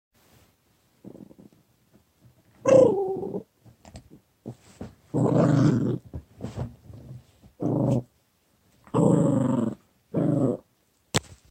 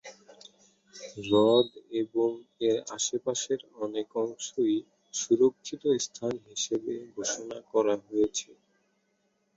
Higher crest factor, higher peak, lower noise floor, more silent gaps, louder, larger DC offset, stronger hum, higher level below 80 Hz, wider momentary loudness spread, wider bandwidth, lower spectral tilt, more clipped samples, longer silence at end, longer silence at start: about the same, 24 dB vs 20 dB; first, -4 dBFS vs -10 dBFS; second, -67 dBFS vs -74 dBFS; neither; first, -24 LUFS vs -29 LUFS; neither; neither; first, -56 dBFS vs -70 dBFS; first, 25 LU vs 12 LU; first, 15.5 kHz vs 8 kHz; first, -7.5 dB/octave vs -3.5 dB/octave; neither; second, 0.3 s vs 1.05 s; first, 1.05 s vs 0.05 s